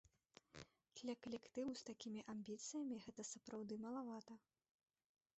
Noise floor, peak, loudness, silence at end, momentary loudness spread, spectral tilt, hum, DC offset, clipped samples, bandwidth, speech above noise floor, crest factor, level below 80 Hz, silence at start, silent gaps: -73 dBFS; -36 dBFS; -52 LUFS; 1 s; 14 LU; -4 dB/octave; none; under 0.1%; under 0.1%; 8.2 kHz; 22 dB; 16 dB; -86 dBFS; 0.55 s; none